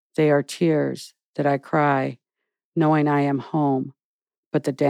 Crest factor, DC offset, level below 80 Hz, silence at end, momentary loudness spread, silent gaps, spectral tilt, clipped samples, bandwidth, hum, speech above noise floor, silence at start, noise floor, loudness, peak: 16 dB; under 0.1%; -84 dBFS; 0 s; 11 LU; 1.24-1.34 s, 2.65-2.72 s, 4.04-4.19 s, 4.37-4.51 s; -7 dB/octave; under 0.1%; 13.5 kHz; none; 63 dB; 0.2 s; -84 dBFS; -22 LUFS; -6 dBFS